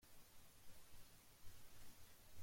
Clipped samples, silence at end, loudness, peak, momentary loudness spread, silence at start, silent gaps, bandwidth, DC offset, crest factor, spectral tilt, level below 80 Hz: under 0.1%; 0 s; -66 LUFS; -44 dBFS; 2 LU; 0 s; none; 16.5 kHz; under 0.1%; 14 dB; -3 dB/octave; -72 dBFS